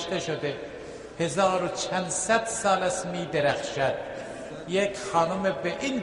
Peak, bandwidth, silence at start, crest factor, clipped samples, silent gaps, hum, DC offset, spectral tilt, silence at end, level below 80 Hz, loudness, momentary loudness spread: -10 dBFS; 11.5 kHz; 0 s; 18 dB; under 0.1%; none; none; under 0.1%; -3.5 dB/octave; 0 s; -58 dBFS; -27 LUFS; 13 LU